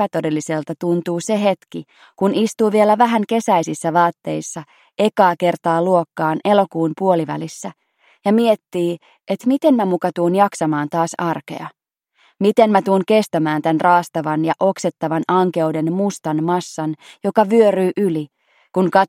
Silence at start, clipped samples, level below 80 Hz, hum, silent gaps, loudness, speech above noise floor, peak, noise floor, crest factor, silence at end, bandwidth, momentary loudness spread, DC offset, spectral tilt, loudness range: 0 s; under 0.1%; -68 dBFS; none; none; -18 LUFS; 42 dB; 0 dBFS; -60 dBFS; 18 dB; 0 s; 16 kHz; 12 LU; under 0.1%; -6 dB/octave; 2 LU